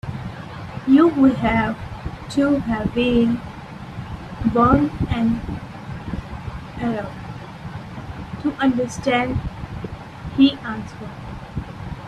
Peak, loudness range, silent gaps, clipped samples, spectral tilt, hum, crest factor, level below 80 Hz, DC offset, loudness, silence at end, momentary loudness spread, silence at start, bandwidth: -2 dBFS; 8 LU; none; under 0.1%; -7 dB/octave; none; 20 dB; -38 dBFS; under 0.1%; -20 LUFS; 0 s; 18 LU; 0.05 s; 10 kHz